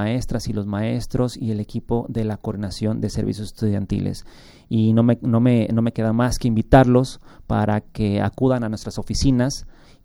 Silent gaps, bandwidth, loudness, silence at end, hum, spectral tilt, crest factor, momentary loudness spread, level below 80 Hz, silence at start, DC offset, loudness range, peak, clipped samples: none; 16 kHz; -21 LUFS; 0.35 s; none; -7 dB/octave; 20 dB; 10 LU; -34 dBFS; 0 s; under 0.1%; 6 LU; -2 dBFS; under 0.1%